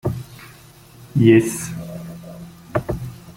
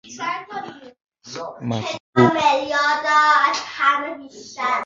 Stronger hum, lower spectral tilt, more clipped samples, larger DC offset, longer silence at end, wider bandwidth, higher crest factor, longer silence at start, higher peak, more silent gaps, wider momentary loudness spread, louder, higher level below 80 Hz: neither; first, -6.5 dB/octave vs -4.5 dB/octave; neither; neither; about the same, 0.05 s vs 0 s; first, 16.5 kHz vs 7.8 kHz; about the same, 20 dB vs 18 dB; about the same, 0.05 s vs 0.05 s; about the same, 0 dBFS vs -2 dBFS; second, none vs 2.00-2.13 s; first, 25 LU vs 18 LU; about the same, -19 LUFS vs -19 LUFS; first, -44 dBFS vs -60 dBFS